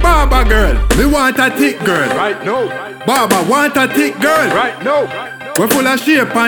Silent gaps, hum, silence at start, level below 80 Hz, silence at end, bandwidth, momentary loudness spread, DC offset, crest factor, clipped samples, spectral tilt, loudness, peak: none; none; 0 s; -20 dBFS; 0 s; 20 kHz; 6 LU; under 0.1%; 12 dB; under 0.1%; -4.5 dB/octave; -13 LUFS; 0 dBFS